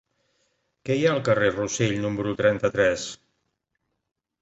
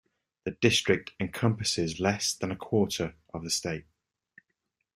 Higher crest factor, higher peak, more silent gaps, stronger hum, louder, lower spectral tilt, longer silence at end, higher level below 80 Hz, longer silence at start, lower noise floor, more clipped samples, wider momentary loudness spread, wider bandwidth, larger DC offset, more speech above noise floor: about the same, 18 dB vs 22 dB; about the same, -6 dBFS vs -8 dBFS; neither; neither; first, -23 LUFS vs -29 LUFS; about the same, -5 dB/octave vs -4 dB/octave; about the same, 1.25 s vs 1.15 s; about the same, -56 dBFS vs -60 dBFS; first, 0.85 s vs 0.45 s; about the same, -78 dBFS vs -81 dBFS; neither; about the same, 11 LU vs 13 LU; second, 8.2 kHz vs 15.5 kHz; neither; about the same, 55 dB vs 52 dB